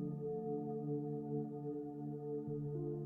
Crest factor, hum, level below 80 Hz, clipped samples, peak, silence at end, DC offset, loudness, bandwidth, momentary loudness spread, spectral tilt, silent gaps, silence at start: 12 dB; none; -74 dBFS; under 0.1%; -30 dBFS; 0 s; under 0.1%; -43 LUFS; 1.9 kHz; 3 LU; -13 dB/octave; none; 0 s